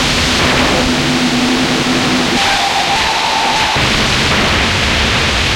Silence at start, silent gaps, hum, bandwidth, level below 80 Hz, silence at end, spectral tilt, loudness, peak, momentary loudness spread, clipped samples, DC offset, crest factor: 0 s; none; none; 16.5 kHz; -28 dBFS; 0 s; -3 dB/octave; -11 LUFS; 0 dBFS; 2 LU; under 0.1%; under 0.1%; 12 dB